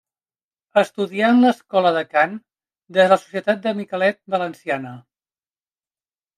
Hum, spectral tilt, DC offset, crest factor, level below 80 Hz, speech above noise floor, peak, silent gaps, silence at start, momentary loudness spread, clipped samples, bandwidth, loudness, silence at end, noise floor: none; -6 dB/octave; under 0.1%; 18 dB; -74 dBFS; over 71 dB; -2 dBFS; none; 0.75 s; 10 LU; under 0.1%; 12.5 kHz; -19 LUFS; 1.4 s; under -90 dBFS